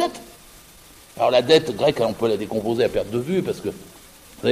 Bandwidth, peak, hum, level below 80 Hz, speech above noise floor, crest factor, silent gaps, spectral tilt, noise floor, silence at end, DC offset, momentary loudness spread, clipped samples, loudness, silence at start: 15.5 kHz; -4 dBFS; none; -52 dBFS; 27 dB; 18 dB; none; -5 dB/octave; -47 dBFS; 0 s; under 0.1%; 15 LU; under 0.1%; -21 LUFS; 0 s